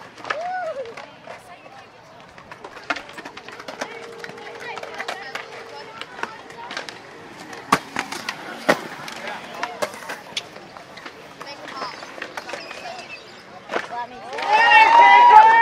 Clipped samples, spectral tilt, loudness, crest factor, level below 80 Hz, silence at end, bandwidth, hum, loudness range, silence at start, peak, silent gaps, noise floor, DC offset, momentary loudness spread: under 0.1%; -2.5 dB/octave; -18 LUFS; 22 dB; -66 dBFS; 0 s; 15.5 kHz; none; 15 LU; 0.2 s; 0 dBFS; none; -45 dBFS; under 0.1%; 27 LU